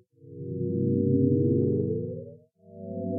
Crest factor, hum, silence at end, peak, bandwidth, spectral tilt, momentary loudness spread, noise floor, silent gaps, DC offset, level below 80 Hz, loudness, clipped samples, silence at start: 16 dB; none; 0 s; -12 dBFS; 0.9 kHz; -18.5 dB/octave; 18 LU; -50 dBFS; none; under 0.1%; -66 dBFS; -27 LUFS; under 0.1%; 0.25 s